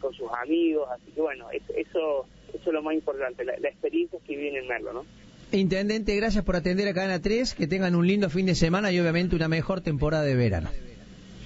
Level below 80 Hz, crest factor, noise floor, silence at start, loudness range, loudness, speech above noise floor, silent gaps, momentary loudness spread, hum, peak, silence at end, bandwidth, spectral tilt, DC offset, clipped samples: -42 dBFS; 16 dB; -46 dBFS; 0 s; 5 LU; -27 LUFS; 20 dB; none; 10 LU; none; -10 dBFS; 0 s; 8 kHz; -6.5 dB/octave; under 0.1%; under 0.1%